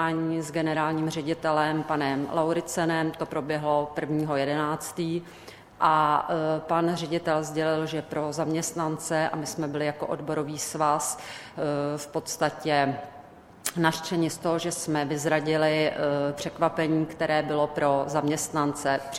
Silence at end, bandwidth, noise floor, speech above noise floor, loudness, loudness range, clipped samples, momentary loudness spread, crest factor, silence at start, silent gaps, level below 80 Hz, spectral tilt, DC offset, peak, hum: 0 s; 16.5 kHz; -48 dBFS; 22 dB; -27 LUFS; 3 LU; under 0.1%; 6 LU; 20 dB; 0 s; none; -62 dBFS; -4.5 dB/octave; under 0.1%; -6 dBFS; none